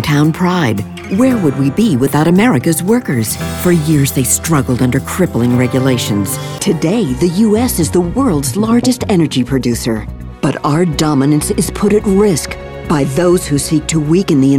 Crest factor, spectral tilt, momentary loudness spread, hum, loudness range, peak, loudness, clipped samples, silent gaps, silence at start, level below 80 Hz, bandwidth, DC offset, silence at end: 10 dB; -5.5 dB/octave; 6 LU; none; 2 LU; -2 dBFS; -13 LUFS; under 0.1%; none; 0 s; -34 dBFS; 19.5 kHz; under 0.1%; 0 s